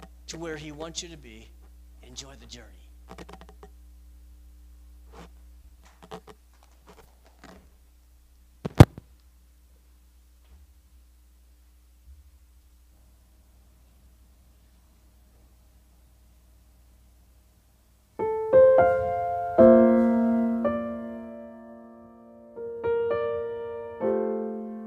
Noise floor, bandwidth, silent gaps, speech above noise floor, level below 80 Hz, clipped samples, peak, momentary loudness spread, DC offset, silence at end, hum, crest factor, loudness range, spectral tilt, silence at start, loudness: -60 dBFS; 15 kHz; none; 20 dB; -46 dBFS; under 0.1%; 0 dBFS; 28 LU; under 0.1%; 0 s; none; 28 dB; 25 LU; -7.5 dB/octave; 0 s; -23 LUFS